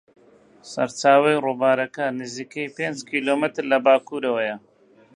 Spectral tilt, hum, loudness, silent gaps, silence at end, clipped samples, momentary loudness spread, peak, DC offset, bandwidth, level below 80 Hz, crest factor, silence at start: -4.5 dB/octave; none; -22 LUFS; none; 0.6 s; under 0.1%; 14 LU; -2 dBFS; under 0.1%; 10.5 kHz; -76 dBFS; 20 dB; 0.65 s